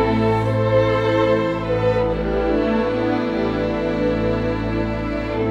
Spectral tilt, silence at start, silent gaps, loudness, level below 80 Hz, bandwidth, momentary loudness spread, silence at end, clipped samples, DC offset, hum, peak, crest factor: -8 dB/octave; 0 s; none; -20 LUFS; -34 dBFS; 8.2 kHz; 5 LU; 0 s; under 0.1%; under 0.1%; none; -6 dBFS; 14 dB